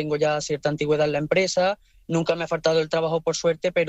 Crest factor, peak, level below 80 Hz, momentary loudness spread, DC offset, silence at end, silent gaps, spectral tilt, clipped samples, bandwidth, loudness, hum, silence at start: 16 dB; -8 dBFS; -56 dBFS; 4 LU; under 0.1%; 0 s; none; -4.5 dB/octave; under 0.1%; 8.4 kHz; -23 LUFS; none; 0 s